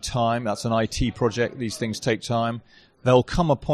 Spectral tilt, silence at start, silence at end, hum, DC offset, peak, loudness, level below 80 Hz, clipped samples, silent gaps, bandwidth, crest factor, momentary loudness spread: -5.5 dB/octave; 0 s; 0 s; none; under 0.1%; -6 dBFS; -24 LUFS; -40 dBFS; under 0.1%; none; 13.5 kHz; 18 dB; 8 LU